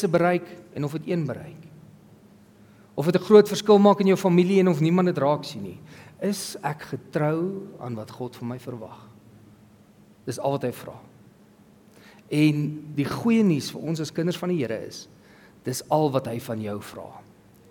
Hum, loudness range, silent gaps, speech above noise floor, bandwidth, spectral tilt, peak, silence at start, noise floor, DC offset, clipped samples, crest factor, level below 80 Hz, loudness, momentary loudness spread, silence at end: none; 14 LU; none; 30 dB; 18 kHz; -6.5 dB/octave; -4 dBFS; 0 s; -54 dBFS; under 0.1%; under 0.1%; 22 dB; -68 dBFS; -24 LUFS; 21 LU; 0.5 s